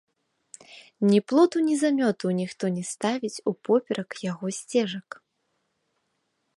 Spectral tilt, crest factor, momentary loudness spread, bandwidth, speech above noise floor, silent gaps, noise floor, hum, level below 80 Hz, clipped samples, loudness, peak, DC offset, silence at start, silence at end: -5.5 dB/octave; 18 dB; 14 LU; 11.5 kHz; 51 dB; none; -75 dBFS; none; -76 dBFS; under 0.1%; -25 LUFS; -8 dBFS; under 0.1%; 0.7 s; 1.6 s